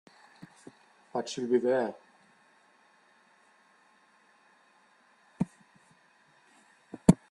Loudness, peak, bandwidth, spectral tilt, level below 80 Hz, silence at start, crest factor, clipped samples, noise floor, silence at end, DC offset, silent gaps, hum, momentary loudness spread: -30 LUFS; -2 dBFS; 12 kHz; -7 dB/octave; -62 dBFS; 1.15 s; 32 dB; under 0.1%; -64 dBFS; 0.15 s; under 0.1%; none; none; 28 LU